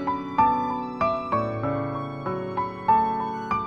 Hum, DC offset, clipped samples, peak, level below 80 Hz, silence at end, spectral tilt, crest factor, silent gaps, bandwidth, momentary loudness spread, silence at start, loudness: none; under 0.1%; under 0.1%; -8 dBFS; -52 dBFS; 0 s; -8 dB/octave; 16 dB; none; 7 kHz; 9 LU; 0 s; -25 LUFS